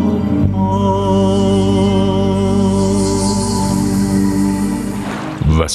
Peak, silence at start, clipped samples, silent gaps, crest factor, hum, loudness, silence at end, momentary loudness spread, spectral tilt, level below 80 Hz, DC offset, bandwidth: 0 dBFS; 0 s; under 0.1%; none; 14 dB; 50 Hz at -45 dBFS; -15 LUFS; 0 s; 5 LU; -6.5 dB/octave; -28 dBFS; under 0.1%; 13.5 kHz